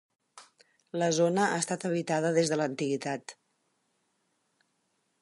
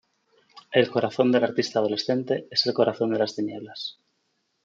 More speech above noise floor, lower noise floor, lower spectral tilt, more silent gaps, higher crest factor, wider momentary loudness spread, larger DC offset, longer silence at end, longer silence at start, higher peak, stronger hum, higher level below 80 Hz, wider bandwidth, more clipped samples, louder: about the same, 48 dB vs 49 dB; about the same, -76 dBFS vs -73 dBFS; about the same, -4.5 dB/octave vs -5 dB/octave; neither; about the same, 20 dB vs 20 dB; about the same, 11 LU vs 12 LU; neither; first, 1.9 s vs 0.75 s; second, 0.35 s vs 0.55 s; second, -12 dBFS vs -6 dBFS; neither; about the same, -78 dBFS vs -74 dBFS; first, 11.5 kHz vs 7.6 kHz; neither; second, -29 LUFS vs -24 LUFS